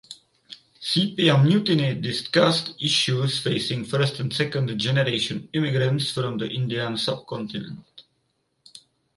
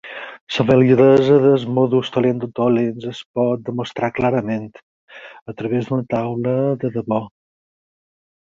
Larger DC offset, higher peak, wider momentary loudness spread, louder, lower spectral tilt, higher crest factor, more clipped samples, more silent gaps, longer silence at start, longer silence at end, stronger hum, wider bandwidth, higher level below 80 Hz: neither; about the same, -4 dBFS vs -2 dBFS; second, 12 LU vs 17 LU; second, -23 LUFS vs -18 LUFS; second, -5.5 dB/octave vs -8 dB/octave; about the same, 20 dB vs 18 dB; neither; second, none vs 0.41-0.47 s, 3.25-3.34 s, 4.83-5.08 s, 5.42-5.46 s; about the same, 0.1 s vs 0.05 s; second, 0.4 s vs 1.2 s; neither; first, 11.5 kHz vs 7.4 kHz; second, -62 dBFS vs -54 dBFS